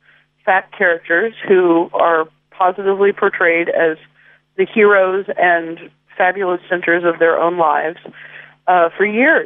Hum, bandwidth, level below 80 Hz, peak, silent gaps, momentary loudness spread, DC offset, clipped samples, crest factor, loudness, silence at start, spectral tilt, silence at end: none; 3.8 kHz; -72 dBFS; -2 dBFS; none; 13 LU; under 0.1%; under 0.1%; 14 dB; -15 LUFS; 0.45 s; -9 dB/octave; 0 s